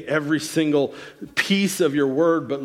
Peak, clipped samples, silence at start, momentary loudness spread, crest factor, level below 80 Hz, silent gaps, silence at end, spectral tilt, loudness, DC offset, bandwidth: -6 dBFS; under 0.1%; 0 s; 7 LU; 16 dB; -64 dBFS; none; 0 s; -4.5 dB/octave; -21 LUFS; under 0.1%; 16 kHz